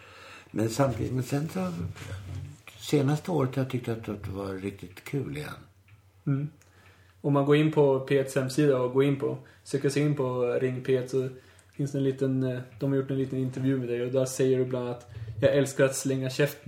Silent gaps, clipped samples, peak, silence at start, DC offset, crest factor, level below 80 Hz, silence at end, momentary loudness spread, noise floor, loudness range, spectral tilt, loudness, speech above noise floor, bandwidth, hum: none; under 0.1%; -8 dBFS; 0 s; under 0.1%; 20 dB; -62 dBFS; 0.1 s; 15 LU; -57 dBFS; 7 LU; -6.5 dB/octave; -28 LUFS; 30 dB; 17 kHz; none